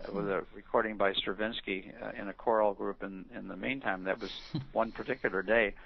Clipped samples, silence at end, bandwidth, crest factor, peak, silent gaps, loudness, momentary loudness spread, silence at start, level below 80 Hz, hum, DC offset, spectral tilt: under 0.1%; 0 s; 6.2 kHz; 22 dB; -12 dBFS; none; -34 LUFS; 12 LU; 0 s; -56 dBFS; none; under 0.1%; -2.5 dB/octave